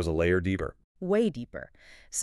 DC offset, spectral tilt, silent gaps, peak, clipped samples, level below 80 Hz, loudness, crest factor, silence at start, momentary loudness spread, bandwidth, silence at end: under 0.1%; -5.5 dB/octave; 0.84-0.95 s; -14 dBFS; under 0.1%; -46 dBFS; -29 LUFS; 16 dB; 0 s; 16 LU; 12 kHz; 0 s